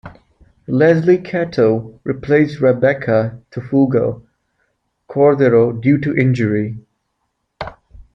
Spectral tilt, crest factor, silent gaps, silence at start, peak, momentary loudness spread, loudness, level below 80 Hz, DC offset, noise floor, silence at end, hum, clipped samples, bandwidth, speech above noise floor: -9 dB/octave; 16 dB; none; 0.05 s; 0 dBFS; 17 LU; -15 LUFS; -50 dBFS; under 0.1%; -71 dBFS; 0.15 s; none; under 0.1%; 7.4 kHz; 56 dB